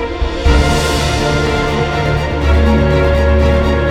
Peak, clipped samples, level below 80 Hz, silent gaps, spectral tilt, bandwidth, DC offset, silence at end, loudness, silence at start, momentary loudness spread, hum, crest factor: 0 dBFS; under 0.1%; -16 dBFS; none; -6 dB/octave; 13.5 kHz; under 0.1%; 0 s; -13 LUFS; 0 s; 4 LU; none; 12 dB